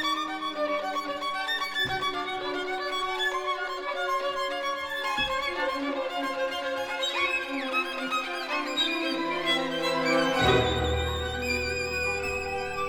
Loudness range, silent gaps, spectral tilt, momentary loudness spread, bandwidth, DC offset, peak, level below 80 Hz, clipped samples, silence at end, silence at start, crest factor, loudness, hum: 3 LU; none; -4 dB/octave; 6 LU; 19 kHz; under 0.1%; -10 dBFS; -46 dBFS; under 0.1%; 0 s; 0 s; 20 dB; -28 LUFS; none